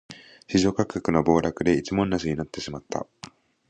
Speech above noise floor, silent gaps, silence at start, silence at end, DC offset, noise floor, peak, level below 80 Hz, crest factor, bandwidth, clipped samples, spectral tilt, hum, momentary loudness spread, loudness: 23 dB; none; 0.1 s; 0.45 s; under 0.1%; -47 dBFS; -6 dBFS; -48 dBFS; 20 dB; 9.2 kHz; under 0.1%; -6 dB/octave; none; 22 LU; -25 LUFS